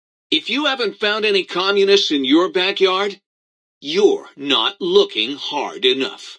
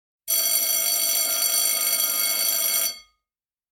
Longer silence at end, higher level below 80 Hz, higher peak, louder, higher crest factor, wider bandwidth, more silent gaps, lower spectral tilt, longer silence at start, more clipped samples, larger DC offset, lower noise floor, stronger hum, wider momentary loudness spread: second, 0 s vs 0.7 s; second, -76 dBFS vs -66 dBFS; first, -2 dBFS vs -6 dBFS; first, -17 LUFS vs -20 LUFS; about the same, 16 dB vs 18 dB; second, 9.6 kHz vs 16.5 kHz; first, 3.26-3.81 s vs none; first, -3 dB/octave vs 3.5 dB/octave; about the same, 0.3 s vs 0.25 s; neither; neither; about the same, under -90 dBFS vs under -90 dBFS; neither; first, 8 LU vs 4 LU